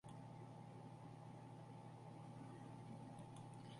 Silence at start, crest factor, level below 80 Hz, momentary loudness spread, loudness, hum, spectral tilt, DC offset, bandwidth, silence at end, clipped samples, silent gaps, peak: 0.05 s; 12 dB; -82 dBFS; 2 LU; -58 LUFS; none; -7 dB/octave; under 0.1%; 11.5 kHz; 0 s; under 0.1%; none; -44 dBFS